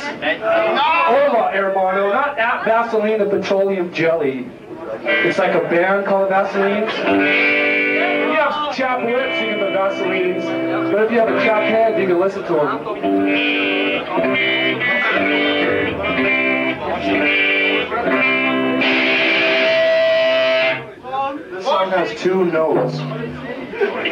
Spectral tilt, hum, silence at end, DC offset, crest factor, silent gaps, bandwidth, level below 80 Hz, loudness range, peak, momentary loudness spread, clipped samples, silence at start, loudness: -5.5 dB/octave; none; 0 s; under 0.1%; 12 dB; none; 16 kHz; -56 dBFS; 3 LU; -6 dBFS; 7 LU; under 0.1%; 0 s; -16 LUFS